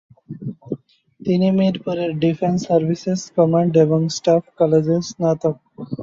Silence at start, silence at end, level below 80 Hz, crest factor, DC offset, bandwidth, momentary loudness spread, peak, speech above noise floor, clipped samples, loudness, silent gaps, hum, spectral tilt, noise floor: 0.3 s; 0 s; -60 dBFS; 16 dB; under 0.1%; 7.8 kHz; 16 LU; -2 dBFS; 28 dB; under 0.1%; -18 LUFS; none; none; -7 dB/octave; -45 dBFS